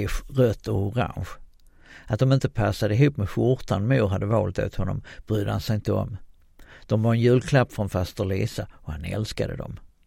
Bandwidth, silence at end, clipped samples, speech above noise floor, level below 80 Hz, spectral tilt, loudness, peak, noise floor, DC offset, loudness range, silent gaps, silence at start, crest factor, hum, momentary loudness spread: 16 kHz; 0.2 s; under 0.1%; 27 dB; -40 dBFS; -7.5 dB/octave; -25 LUFS; -6 dBFS; -50 dBFS; under 0.1%; 2 LU; none; 0 s; 20 dB; none; 14 LU